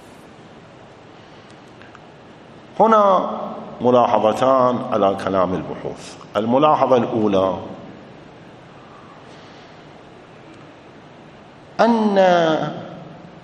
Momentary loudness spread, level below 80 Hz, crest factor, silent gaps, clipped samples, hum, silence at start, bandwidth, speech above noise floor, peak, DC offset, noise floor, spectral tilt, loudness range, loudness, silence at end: 21 LU; -60 dBFS; 20 dB; none; under 0.1%; none; 1.35 s; 11.5 kHz; 26 dB; 0 dBFS; under 0.1%; -43 dBFS; -6.5 dB/octave; 8 LU; -17 LUFS; 0.05 s